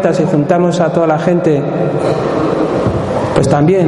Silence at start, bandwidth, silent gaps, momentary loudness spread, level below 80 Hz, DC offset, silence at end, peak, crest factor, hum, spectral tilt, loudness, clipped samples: 0 s; 11.5 kHz; none; 4 LU; -38 dBFS; under 0.1%; 0 s; 0 dBFS; 12 dB; none; -7.5 dB/octave; -13 LUFS; under 0.1%